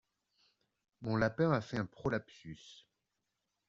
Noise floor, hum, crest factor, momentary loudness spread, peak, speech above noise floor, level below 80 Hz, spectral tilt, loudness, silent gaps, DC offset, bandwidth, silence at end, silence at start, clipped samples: -86 dBFS; none; 22 dB; 20 LU; -16 dBFS; 51 dB; -66 dBFS; -6 dB/octave; -36 LUFS; none; under 0.1%; 7.6 kHz; 0.95 s; 1 s; under 0.1%